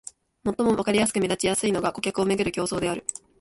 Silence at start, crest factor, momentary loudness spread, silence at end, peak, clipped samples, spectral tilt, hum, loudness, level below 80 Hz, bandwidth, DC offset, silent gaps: 0.45 s; 16 dB; 9 LU; 0.25 s; -8 dBFS; under 0.1%; -4 dB/octave; none; -25 LUFS; -54 dBFS; 12 kHz; under 0.1%; none